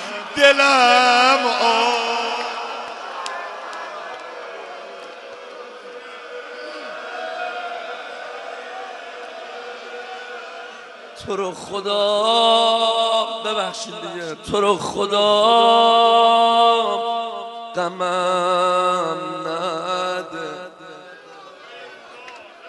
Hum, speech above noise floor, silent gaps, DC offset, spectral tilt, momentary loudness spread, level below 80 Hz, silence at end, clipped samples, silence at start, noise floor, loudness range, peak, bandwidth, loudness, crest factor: none; 25 dB; none; under 0.1%; -2.5 dB/octave; 23 LU; -62 dBFS; 0 s; under 0.1%; 0 s; -41 dBFS; 16 LU; 0 dBFS; 11.5 kHz; -18 LUFS; 20 dB